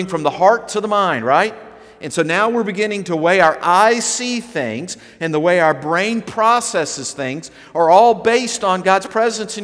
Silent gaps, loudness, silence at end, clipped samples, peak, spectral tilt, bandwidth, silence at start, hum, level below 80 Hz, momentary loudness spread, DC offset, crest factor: none; -16 LUFS; 0 s; under 0.1%; 0 dBFS; -3.5 dB/octave; 11 kHz; 0 s; none; -60 dBFS; 11 LU; under 0.1%; 16 dB